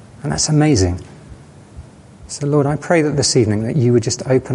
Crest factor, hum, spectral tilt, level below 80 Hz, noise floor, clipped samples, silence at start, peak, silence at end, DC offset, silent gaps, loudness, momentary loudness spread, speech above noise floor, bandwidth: 16 dB; none; -5 dB/octave; -36 dBFS; -39 dBFS; under 0.1%; 0.2 s; -2 dBFS; 0 s; under 0.1%; none; -16 LUFS; 10 LU; 24 dB; 11.5 kHz